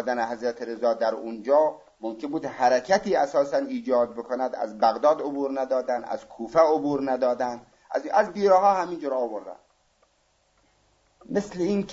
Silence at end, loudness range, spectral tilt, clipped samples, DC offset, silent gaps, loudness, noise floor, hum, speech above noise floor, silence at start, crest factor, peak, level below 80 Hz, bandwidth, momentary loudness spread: 0 s; 2 LU; -5.5 dB/octave; under 0.1%; under 0.1%; none; -25 LUFS; -67 dBFS; none; 43 dB; 0 s; 18 dB; -6 dBFS; -64 dBFS; 7.8 kHz; 11 LU